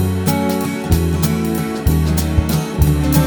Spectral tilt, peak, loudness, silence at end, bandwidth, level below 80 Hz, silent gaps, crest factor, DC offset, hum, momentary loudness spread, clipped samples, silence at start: -6 dB/octave; -2 dBFS; -17 LUFS; 0 s; over 20 kHz; -22 dBFS; none; 14 dB; under 0.1%; none; 3 LU; under 0.1%; 0 s